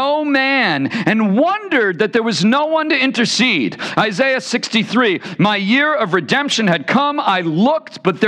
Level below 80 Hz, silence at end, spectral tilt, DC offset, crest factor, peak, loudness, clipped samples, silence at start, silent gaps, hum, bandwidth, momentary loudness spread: -66 dBFS; 0 s; -4.5 dB/octave; under 0.1%; 14 dB; 0 dBFS; -15 LUFS; under 0.1%; 0 s; none; none; 10.5 kHz; 3 LU